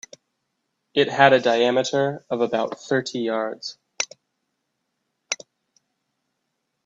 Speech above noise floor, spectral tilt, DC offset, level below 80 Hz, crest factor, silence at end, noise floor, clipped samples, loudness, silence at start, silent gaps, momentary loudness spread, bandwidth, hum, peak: 56 dB; -3.5 dB/octave; under 0.1%; -72 dBFS; 22 dB; 1.5 s; -77 dBFS; under 0.1%; -22 LUFS; 0.95 s; none; 15 LU; 8 kHz; none; -2 dBFS